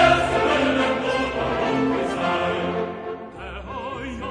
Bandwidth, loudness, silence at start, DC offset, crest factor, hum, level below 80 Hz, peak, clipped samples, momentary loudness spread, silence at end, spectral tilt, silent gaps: 10.5 kHz; -23 LUFS; 0 s; under 0.1%; 18 dB; none; -42 dBFS; -4 dBFS; under 0.1%; 14 LU; 0 s; -5.5 dB/octave; none